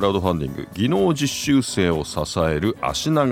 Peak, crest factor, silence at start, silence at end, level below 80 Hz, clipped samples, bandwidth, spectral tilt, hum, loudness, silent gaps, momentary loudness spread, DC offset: -4 dBFS; 16 dB; 0 s; 0 s; -44 dBFS; under 0.1%; 16.5 kHz; -5 dB/octave; none; -21 LUFS; none; 5 LU; under 0.1%